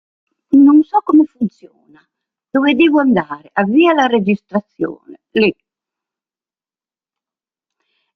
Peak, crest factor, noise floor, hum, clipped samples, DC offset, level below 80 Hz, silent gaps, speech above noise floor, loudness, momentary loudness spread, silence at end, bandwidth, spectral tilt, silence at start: 0 dBFS; 14 dB; under -90 dBFS; none; under 0.1%; under 0.1%; -60 dBFS; none; over 76 dB; -14 LUFS; 13 LU; 2.65 s; 6.2 kHz; -7 dB/octave; 0.5 s